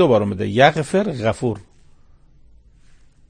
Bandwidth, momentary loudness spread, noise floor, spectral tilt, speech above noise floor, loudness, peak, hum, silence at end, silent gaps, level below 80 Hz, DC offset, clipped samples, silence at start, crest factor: 9.8 kHz; 10 LU; -49 dBFS; -6 dB/octave; 31 dB; -18 LUFS; 0 dBFS; none; 1.65 s; none; -48 dBFS; under 0.1%; under 0.1%; 0 s; 20 dB